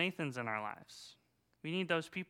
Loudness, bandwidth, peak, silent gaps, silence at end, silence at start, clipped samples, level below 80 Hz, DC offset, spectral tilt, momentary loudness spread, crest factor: -39 LUFS; 16.5 kHz; -18 dBFS; none; 0.05 s; 0 s; under 0.1%; -84 dBFS; under 0.1%; -5 dB/octave; 18 LU; 22 dB